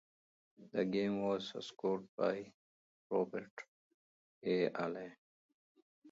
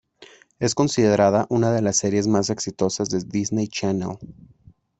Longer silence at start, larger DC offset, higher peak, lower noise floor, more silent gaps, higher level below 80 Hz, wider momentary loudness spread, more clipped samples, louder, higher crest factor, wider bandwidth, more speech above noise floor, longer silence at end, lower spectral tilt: first, 0.6 s vs 0.2 s; neither; second, -20 dBFS vs -4 dBFS; first, under -90 dBFS vs -50 dBFS; first, 2.09-2.18 s, 2.54-3.10 s, 3.51-3.57 s, 3.68-4.41 s, 5.18-5.75 s, 5.82-6.02 s vs none; second, -82 dBFS vs -56 dBFS; first, 17 LU vs 8 LU; neither; second, -39 LUFS vs -21 LUFS; about the same, 20 dB vs 18 dB; second, 7.6 kHz vs 8.4 kHz; first, over 52 dB vs 29 dB; second, 0 s vs 0.65 s; about the same, -5 dB/octave vs -5 dB/octave